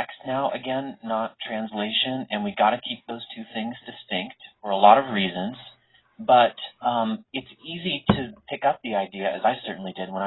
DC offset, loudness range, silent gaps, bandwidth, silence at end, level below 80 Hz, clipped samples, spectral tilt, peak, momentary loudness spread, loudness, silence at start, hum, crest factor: under 0.1%; 5 LU; none; 4.1 kHz; 0 s; -56 dBFS; under 0.1%; -9.5 dB/octave; -2 dBFS; 16 LU; -25 LUFS; 0 s; none; 24 dB